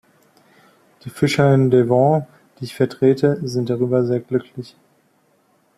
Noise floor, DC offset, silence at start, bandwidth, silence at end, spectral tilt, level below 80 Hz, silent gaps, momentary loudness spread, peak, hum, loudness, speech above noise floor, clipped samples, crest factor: -60 dBFS; under 0.1%; 1.05 s; 14 kHz; 1.15 s; -7.5 dB/octave; -58 dBFS; none; 21 LU; -2 dBFS; none; -18 LUFS; 43 dB; under 0.1%; 16 dB